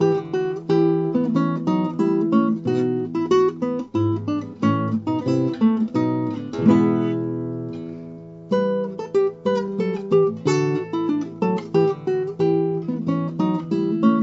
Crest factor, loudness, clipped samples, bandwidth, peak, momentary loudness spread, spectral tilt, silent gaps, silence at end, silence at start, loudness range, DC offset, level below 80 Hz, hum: 18 dB; -22 LUFS; under 0.1%; 8 kHz; -4 dBFS; 7 LU; -8 dB/octave; none; 0 s; 0 s; 2 LU; under 0.1%; -64 dBFS; none